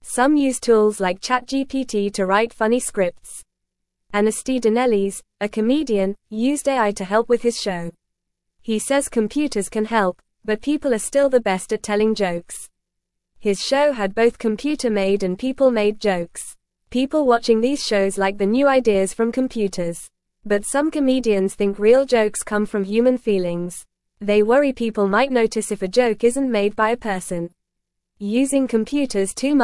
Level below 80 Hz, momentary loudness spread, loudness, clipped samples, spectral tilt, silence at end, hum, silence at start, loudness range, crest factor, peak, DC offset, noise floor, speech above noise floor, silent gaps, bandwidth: -50 dBFS; 10 LU; -20 LUFS; under 0.1%; -4.5 dB/octave; 0 s; none; 0.05 s; 3 LU; 16 dB; -2 dBFS; 0.1%; -78 dBFS; 59 dB; none; 12 kHz